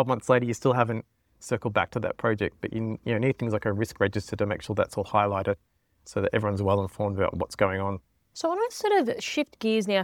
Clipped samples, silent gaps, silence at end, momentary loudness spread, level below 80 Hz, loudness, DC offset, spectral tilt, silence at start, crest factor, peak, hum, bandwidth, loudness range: under 0.1%; none; 0 s; 7 LU; -56 dBFS; -27 LUFS; under 0.1%; -6 dB/octave; 0 s; 20 dB; -6 dBFS; none; 16.5 kHz; 1 LU